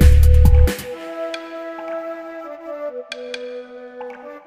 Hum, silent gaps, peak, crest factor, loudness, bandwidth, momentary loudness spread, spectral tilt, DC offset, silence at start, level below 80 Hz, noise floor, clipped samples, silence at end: none; none; 0 dBFS; 16 dB; -20 LUFS; 15.5 kHz; 21 LU; -6.5 dB/octave; under 0.1%; 0 s; -18 dBFS; -34 dBFS; under 0.1%; 0 s